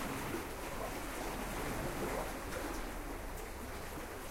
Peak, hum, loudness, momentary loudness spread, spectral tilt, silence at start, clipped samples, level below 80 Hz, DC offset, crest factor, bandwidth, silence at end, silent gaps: -26 dBFS; none; -42 LUFS; 6 LU; -4 dB/octave; 0 s; under 0.1%; -48 dBFS; under 0.1%; 14 dB; 16 kHz; 0 s; none